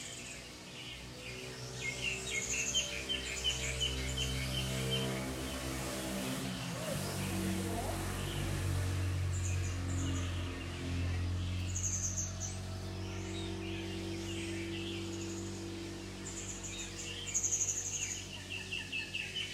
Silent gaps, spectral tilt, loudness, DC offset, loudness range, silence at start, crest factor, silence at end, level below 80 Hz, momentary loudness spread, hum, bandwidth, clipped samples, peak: none; -3 dB/octave; -37 LUFS; under 0.1%; 6 LU; 0 s; 18 dB; 0 s; -50 dBFS; 9 LU; none; 16 kHz; under 0.1%; -20 dBFS